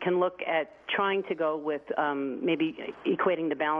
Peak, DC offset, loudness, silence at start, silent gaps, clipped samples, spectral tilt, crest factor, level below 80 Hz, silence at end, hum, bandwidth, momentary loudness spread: -14 dBFS; under 0.1%; -29 LUFS; 0 s; none; under 0.1%; -8 dB/octave; 14 dB; -72 dBFS; 0 s; none; 5 kHz; 4 LU